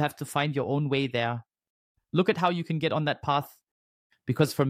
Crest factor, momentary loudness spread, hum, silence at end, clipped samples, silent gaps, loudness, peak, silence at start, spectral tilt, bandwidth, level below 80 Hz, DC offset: 20 dB; 7 LU; none; 0 s; under 0.1%; 1.70-1.95 s, 3.71-4.10 s; -28 LUFS; -8 dBFS; 0 s; -6 dB/octave; 16 kHz; -64 dBFS; under 0.1%